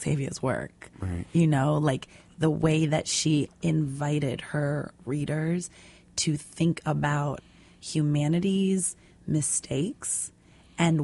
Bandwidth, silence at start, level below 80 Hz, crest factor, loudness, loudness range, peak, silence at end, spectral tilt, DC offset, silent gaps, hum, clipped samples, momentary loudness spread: 11.5 kHz; 0 s; -54 dBFS; 18 dB; -27 LUFS; 3 LU; -10 dBFS; 0 s; -5 dB/octave; under 0.1%; none; none; under 0.1%; 11 LU